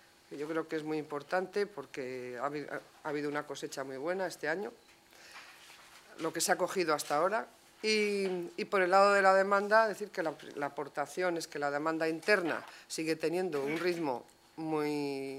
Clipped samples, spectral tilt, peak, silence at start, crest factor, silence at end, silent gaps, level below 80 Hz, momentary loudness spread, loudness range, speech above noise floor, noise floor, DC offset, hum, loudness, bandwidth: under 0.1%; -3.5 dB/octave; -12 dBFS; 0.3 s; 20 dB; 0 s; none; -82 dBFS; 16 LU; 9 LU; 23 dB; -56 dBFS; under 0.1%; none; -33 LUFS; 16 kHz